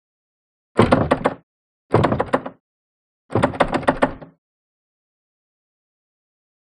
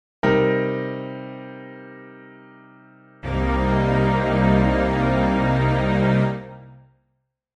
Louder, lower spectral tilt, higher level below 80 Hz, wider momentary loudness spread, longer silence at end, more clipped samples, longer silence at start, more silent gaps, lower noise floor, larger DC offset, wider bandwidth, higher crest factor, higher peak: about the same, -20 LUFS vs -20 LUFS; second, -7 dB/octave vs -8.5 dB/octave; second, -42 dBFS vs -34 dBFS; second, 9 LU vs 20 LU; first, 2.35 s vs 0.8 s; neither; first, 0.75 s vs 0.25 s; first, 1.43-1.89 s, 2.60-3.29 s vs none; first, under -90 dBFS vs -73 dBFS; neither; first, 11.5 kHz vs 8 kHz; first, 22 dB vs 16 dB; first, 0 dBFS vs -6 dBFS